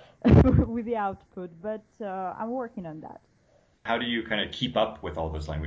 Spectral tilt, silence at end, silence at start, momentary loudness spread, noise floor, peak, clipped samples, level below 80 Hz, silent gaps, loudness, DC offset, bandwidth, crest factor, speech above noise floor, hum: -8 dB/octave; 0 s; 0.25 s; 21 LU; -64 dBFS; -6 dBFS; under 0.1%; -36 dBFS; none; -27 LUFS; under 0.1%; 7.8 kHz; 20 dB; 37 dB; none